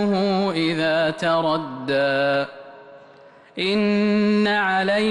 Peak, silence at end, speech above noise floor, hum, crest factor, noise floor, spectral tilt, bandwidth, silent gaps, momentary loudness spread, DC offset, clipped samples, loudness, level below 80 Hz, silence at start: -10 dBFS; 0 s; 28 dB; none; 10 dB; -48 dBFS; -6 dB/octave; 10.5 kHz; none; 7 LU; under 0.1%; under 0.1%; -20 LUFS; -62 dBFS; 0 s